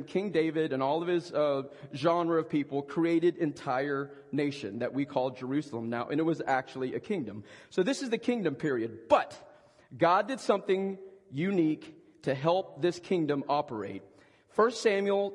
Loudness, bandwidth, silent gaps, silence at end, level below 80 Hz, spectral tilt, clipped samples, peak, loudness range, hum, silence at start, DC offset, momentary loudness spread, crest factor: -30 LUFS; 11 kHz; none; 0 s; -76 dBFS; -6 dB/octave; under 0.1%; -10 dBFS; 3 LU; none; 0 s; under 0.1%; 9 LU; 20 dB